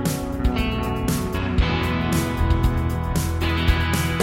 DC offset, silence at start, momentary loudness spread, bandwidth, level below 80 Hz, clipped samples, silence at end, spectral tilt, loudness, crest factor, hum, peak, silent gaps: under 0.1%; 0 s; 3 LU; 16.5 kHz; -26 dBFS; under 0.1%; 0 s; -5.5 dB/octave; -22 LUFS; 16 dB; none; -4 dBFS; none